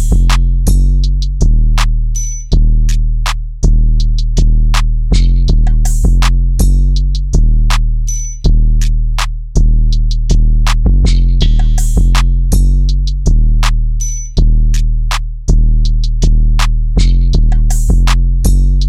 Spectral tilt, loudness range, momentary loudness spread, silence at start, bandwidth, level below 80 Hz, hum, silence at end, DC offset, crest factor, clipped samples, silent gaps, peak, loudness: -5 dB/octave; 2 LU; 5 LU; 0 s; 12.5 kHz; -8 dBFS; none; 0 s; under 0.1%; 8 dB; under 0.1%; none; 0 dBFS; -14 LUFS